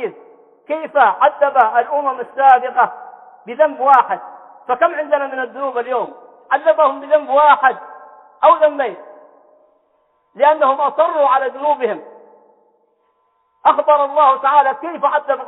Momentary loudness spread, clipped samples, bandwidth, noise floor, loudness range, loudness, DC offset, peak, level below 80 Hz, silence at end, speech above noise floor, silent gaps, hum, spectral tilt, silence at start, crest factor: 12 LU; under 0.1%; 4.1 kHz; -62 dBFS; 3 LU; -15 LUFS; under 0.1%; 0 dBFS; -76 dBFS; 0 s; 48 dB; none; none; -5.5 dB/octave; 0 s; 16 dB